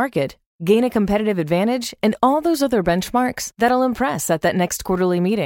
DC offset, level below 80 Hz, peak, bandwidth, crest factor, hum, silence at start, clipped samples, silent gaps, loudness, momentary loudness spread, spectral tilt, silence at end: under 0.1%; -46 dBFS; -2 dBFS; 17 kHz; 16 dB; none; 0 s; under 0.1%; 0.46-0.59 s; -19 LUFS; 5 LU; -5 dB/octave; 0 s